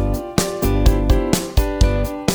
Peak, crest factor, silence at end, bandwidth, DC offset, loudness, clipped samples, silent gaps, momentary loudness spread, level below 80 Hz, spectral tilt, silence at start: 0 dBFS; 16 dB; 0 s; over 20 kHz; under 0.1%; -19 LUFS; under 0.1%; none; 4 LU; -20 dBFS; -5.5 dB/octave; 0 s